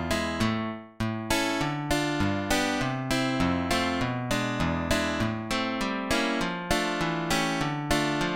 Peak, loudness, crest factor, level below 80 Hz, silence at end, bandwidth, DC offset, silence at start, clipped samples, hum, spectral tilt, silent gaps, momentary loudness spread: -8 dBFS; -27 LUFS; 18 dB; -44 dBFS; 0 s; 17 kHz; 0.2%; 0 s; under 0.1%; none; -4.5 dB/octave; none; 4 LU